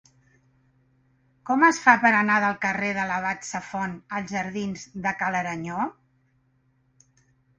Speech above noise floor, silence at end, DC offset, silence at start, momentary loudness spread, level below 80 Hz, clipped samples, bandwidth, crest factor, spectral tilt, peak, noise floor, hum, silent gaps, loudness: 42 dB; 1.7 s; under 0.1%; 1.45 s; 14 LU; -64 dBFS; under 0.1%; 9.8 kHz; 24 dB; -4.5 dB/octave; -2 dBFS; -66 dBFS; none; none; -24 LUFS